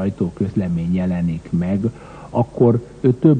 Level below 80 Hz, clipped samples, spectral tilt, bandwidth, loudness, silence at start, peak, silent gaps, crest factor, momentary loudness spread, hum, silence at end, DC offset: -44 dBFS; under 0.1%; -10 dB/octave; 9 kHz; -20 LUFS; 0 s; -2 dBFS; none; 16 dB; 7 LU; none; 0 s; under 0.1%